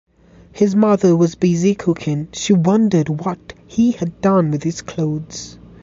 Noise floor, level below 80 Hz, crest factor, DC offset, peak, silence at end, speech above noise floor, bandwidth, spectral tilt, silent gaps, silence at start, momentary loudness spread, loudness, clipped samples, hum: -46 dBFS; -50 dBFS; 14 dB; under 0.1%; -2 dBFS; 0.3 s; 29 dB; 7.8 kHz; -7 dB/octave; none; 0.55 s; 12 LU; -17 LUFS; under 0.1%; none